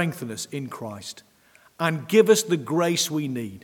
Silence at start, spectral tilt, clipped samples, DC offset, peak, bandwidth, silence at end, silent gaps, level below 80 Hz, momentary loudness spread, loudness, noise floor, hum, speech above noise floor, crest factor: 0 s; -4.5 dB/octave; under 0.1%; under 0.1%; -4 dBFS; 19 kHz; 0.05 s; none; -72 dBFS; 17 LU; -23 LUFS; -57 dBFS; none; 34 dB; 20 dB